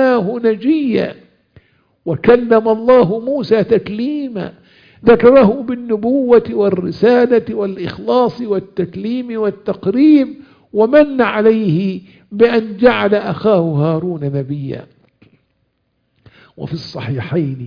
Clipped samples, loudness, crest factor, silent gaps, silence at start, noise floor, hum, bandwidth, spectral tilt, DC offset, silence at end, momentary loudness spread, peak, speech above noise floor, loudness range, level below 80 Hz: under 0.1%; -14 LUFS; 14 dB; none; 0 s; -65 dBFS; none; 5.2 kHz; -9 dB/octave; under 0.1%; 0 s; 13 LU; 0 dBFS; 52 dB; 7 LU; -50 dBFS